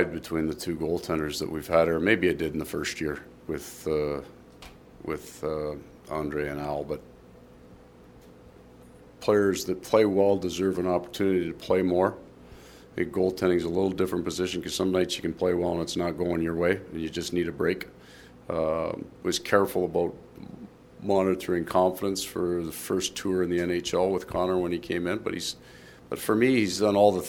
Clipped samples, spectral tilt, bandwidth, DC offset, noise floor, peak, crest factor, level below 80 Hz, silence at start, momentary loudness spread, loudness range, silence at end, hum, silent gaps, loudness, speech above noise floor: under 0.1%; -5 dB/octave; 19 kHz; under 0.1%; -51 dBFS; -6 dBFS; 22 dB; -54 dBFS; 0 s; 13 LU; 8 LU; 0 s; none; none; -27 LUFS; 25 dB